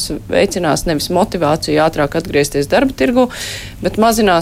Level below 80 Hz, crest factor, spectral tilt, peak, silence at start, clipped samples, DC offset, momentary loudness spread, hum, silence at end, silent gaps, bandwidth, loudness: -34 dBFS; 12 dB; -4.5 dB/octave; -2 dBFS; 0 s; under 0.1%; under 0.1%; 4 LU; none; 0 s; none; 16.5 kHz; -15 LUFS